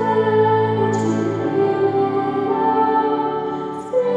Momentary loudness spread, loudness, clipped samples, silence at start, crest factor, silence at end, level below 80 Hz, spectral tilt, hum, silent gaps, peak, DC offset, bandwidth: 6 LU; -19 LUFS; under 0.1%; 0 s; 12 dB; 0 s; -62 dBFS; -7.5 dB/octave; none; none; -6 dBFS; under 0.1%; 8.2 kHz